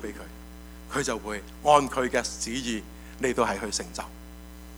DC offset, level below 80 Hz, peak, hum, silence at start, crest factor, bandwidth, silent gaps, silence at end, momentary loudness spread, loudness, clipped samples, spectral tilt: under 0.1%; -46 dBFS; -4 dBFS; none; 0 s; 24 dB; over 20 kHz; none; 0 s; 24 LU; -27 LUFS; under 0.1%; -3.5 dB/octave